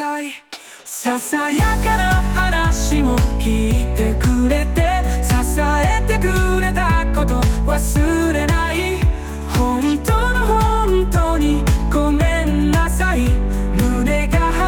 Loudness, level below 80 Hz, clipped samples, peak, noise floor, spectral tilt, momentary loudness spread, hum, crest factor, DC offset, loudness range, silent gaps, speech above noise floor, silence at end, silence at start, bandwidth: -17 LUFS; -20 dBFS; under 0.1%; -4 dBFS; -38 dBFS; -5.5 dB/octave; 3 LU; none; 12 dB; under 0.1%; 1 LU; none; 22 dB; 0 s; 0 s; 19 kHz